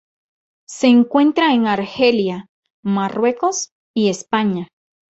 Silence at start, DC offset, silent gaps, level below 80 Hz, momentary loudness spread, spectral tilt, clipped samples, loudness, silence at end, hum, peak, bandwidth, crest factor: 0.7 s; under 0.1%; 2.49-2.63 s, 2.70-2.83 s, 3.72-3.94 s; -62 dBFS; 13 LU; -4.5 dB/octave; under 0.1%; -17 LUFS; 0.5 s; none; -2 dBFS; 8.2 kHz; 16 dB